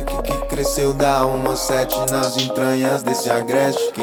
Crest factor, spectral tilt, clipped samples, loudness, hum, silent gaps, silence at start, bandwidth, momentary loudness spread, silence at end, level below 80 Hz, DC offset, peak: 16 dB; -4 dB/octave; under 0.1%; -19 LUFS; none; none; 0 s; over 20 kHz; 4 LU; 0 s; -34 dBFS; under 0.1%; -2 dBFS